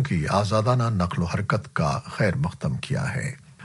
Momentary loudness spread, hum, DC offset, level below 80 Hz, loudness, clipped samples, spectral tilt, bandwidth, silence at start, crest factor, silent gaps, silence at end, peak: 6 LU; none; under 0.1%; -46 dBFS; -25 LUFS; under 0.1%; -6.5 dB/octave; 11.5 kHz; 0 s; 18 dB; none; 0 s; -6 dBFS